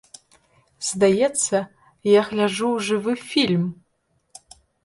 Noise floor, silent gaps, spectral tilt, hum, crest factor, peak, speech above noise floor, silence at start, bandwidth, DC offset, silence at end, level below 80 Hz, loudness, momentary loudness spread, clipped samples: -69 dBFS; none; -4 dB/octave; none; 18 dB; -6 dBFS; 49 dB; 0.8 s; 11.5 kHz; under 0.1%; 1.1 s; -64 dBFS; -21 LUFS; 10 LU; under 0.1%